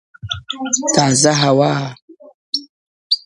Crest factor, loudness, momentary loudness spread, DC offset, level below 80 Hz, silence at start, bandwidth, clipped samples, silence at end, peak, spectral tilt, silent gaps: 18 dB; -16 LUFS; 14 LU; under 0.1%; -50 dBFS; 0.25 s; 11.5 kHz; under 0.1%; 0.05 s; 0 dBFS; -3.5 dB/octave; 2.02-2.08 s, 2.34-2.53 s, 2.69-3.10 s